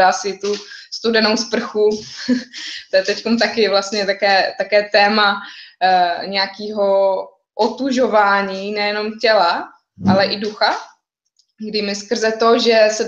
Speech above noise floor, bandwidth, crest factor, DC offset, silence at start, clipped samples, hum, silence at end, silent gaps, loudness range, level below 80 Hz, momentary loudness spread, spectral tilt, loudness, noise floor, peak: 47 dB; 8.4 kHz; 16 dB; under 0.1%; 0 s; under 0.1%; none; 0 s; none; 3 LU; -62 dBFS; 11 LU; -3.5 dB/octave; -17 LUFS; -64 dBFS; -2 dBFS